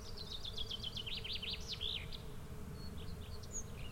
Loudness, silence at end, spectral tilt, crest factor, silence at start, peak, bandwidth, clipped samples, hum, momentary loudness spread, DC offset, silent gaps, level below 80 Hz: -44 LUFS; 0 s; -3 dB/octave; 16 dB; 0 s; -28 dBFS; 16.5 kHz; under 0.1%; none; 9 LU; under 0.1%; none; -50 dBFS